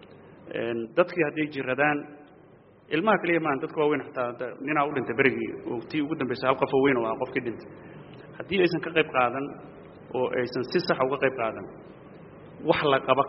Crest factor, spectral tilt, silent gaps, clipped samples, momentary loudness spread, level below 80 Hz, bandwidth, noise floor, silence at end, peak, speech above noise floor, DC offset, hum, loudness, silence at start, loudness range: 22 dB; -3.5 dB/octave; none; under 0.1%; 22 LU; -64 dBFS; 5.8 kHz; -54 dBFS; 0 s; -6 dBFS; 28 dB; under 0.1%; none; -26 LUFS; 0 s; 2 LU